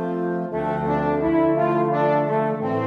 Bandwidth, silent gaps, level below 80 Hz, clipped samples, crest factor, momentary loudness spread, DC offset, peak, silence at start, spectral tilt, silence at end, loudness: 5.6 kHz; none; -48 dBFS; under 0.1%; 12 dB; 6 LU; under 0.1%; -8 dBFS; 0 s; -9.5 dB/octave; 0 s; -21 LUFS